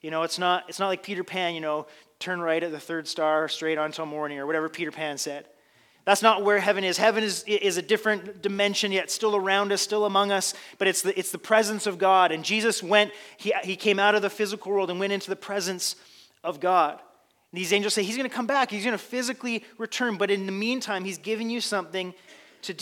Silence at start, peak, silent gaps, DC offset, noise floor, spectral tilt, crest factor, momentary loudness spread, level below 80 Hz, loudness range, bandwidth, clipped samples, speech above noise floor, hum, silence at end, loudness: 0.05 s; -2 dBFS; none; under 0.1%; -61 dBFS; -2.5 dB/octave; 24 dB; 10 LU; -84 dBFS; 5 LU; 18 kHz; under 0.1%; 35 dB; none; 0 s; -25 LUFS